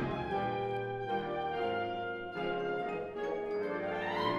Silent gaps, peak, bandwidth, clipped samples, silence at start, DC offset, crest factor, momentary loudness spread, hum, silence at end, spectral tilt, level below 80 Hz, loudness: none; -22 dBFS; 11.5 kHz; under 0.1%; 0 s; under 0.1%; 14 dB; 3 LU; none; 0 s; -7 dB/octave; -62 dBFS; -36 LUFS